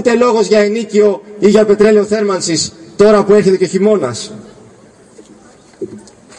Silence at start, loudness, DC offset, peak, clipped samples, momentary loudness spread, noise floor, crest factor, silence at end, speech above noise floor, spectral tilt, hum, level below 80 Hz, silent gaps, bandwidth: 0 s; -11 LUFS; under 0.1%; 0 dBFS; under 0.1%; 17 LU; -42 dBFS; 12 dB; 0.4 s; 32 dB; -5 dB/octave; none; -50 dBFS; none; 10.5 kHz